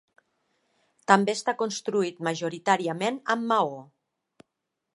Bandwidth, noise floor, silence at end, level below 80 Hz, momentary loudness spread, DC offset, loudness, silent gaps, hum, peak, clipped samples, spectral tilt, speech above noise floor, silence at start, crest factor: 11.5 kHz; -83 dBFS; 1.1 s; -80 dBFS; 8 LU; under 0.1%; -26 LUFS; none; none; -2 dBFS; under 0.1%; -4.5 dB/octave; 57 dB; 1.1 s; 26 dB